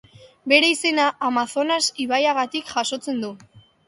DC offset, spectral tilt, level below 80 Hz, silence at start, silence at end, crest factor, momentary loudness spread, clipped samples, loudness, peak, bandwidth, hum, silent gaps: under 0.1%; -1.5 dB/octave; -68 dBFS; 0.45 s; 0.3 s; 22 dB; 12 LU; under 0.1%; -20 LUFS; 0 dBFS; 11.5 kHz; none; none